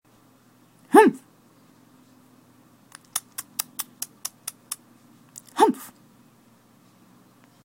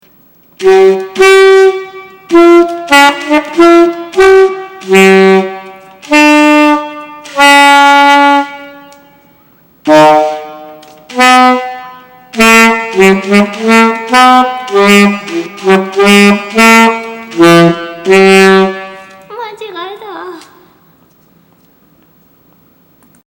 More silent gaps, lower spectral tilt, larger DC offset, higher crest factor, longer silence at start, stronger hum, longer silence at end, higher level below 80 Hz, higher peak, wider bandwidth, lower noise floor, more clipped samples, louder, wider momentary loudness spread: neither; about the same, -3.5 dB/octave vs -4.5 dB/octave; neither; first, 26 dB vs 8 dB; first, 0.9 s vs 0.6 s; neither; second, 1.8 s vs 2.9 s; second, -78 dBFS vs -46 dBFS; about the same, 0 dBFS vs 0 dBFS; second, 16.5 kHz vs over 20 kHz; first, -57 dBFS vs -46 dBFS; second, under 0.1% vs 5%; second, -24 LUFS vs -6 LUFS; first, 25 LU vs 19 LU